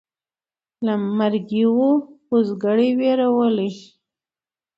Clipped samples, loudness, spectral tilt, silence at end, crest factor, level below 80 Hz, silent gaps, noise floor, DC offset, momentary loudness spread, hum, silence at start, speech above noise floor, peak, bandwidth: under 0.1%; -20 LUFS; -8 dB/octave; 0.95 s; 14 dB; -70 dBFS; none; under -90 dBFS; under 0.1%; 6 LU; none; 0.8 s; over 72 dB; -6 dBFS; 7 kHz